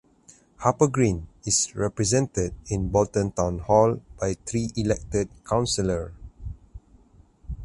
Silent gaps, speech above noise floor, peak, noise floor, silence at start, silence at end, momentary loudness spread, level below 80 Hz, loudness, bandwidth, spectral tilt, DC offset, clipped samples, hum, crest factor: none; 31 dB; -4 dBFS; -55 dBFS; 0.6 s; 0 s; 16 LU; -42 dBFS; -25 LUFS; 11.5 kHz; -5 dB/octave; under 0.1%; under 0.1%; none; 20 dB